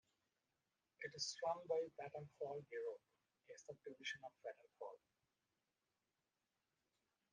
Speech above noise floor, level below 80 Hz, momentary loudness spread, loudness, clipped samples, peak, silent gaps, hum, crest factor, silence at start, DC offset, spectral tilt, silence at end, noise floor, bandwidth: over 40 dB; under -90 dBFS; 15 LU; -49 LUFS; under 0.1%; -32 dBFS; none; none; 22 dB; 1 s; under 0.1%; -2.5 dB/octave; 2.35 s; under -90 dBFS; 9 kHz